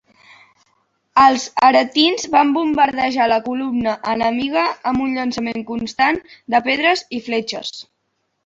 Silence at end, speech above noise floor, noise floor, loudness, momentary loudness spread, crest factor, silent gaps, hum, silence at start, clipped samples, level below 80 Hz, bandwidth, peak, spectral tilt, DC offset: 0.65 s; 53 dB; -71 dBFS; -17 LUFS; 11 LU; 18 dB; none; none; 1.15 s; under 0.1%; -54 dBFS; 7.8 kHz; 0 dBFS; -3 dB/octave; under 0.1%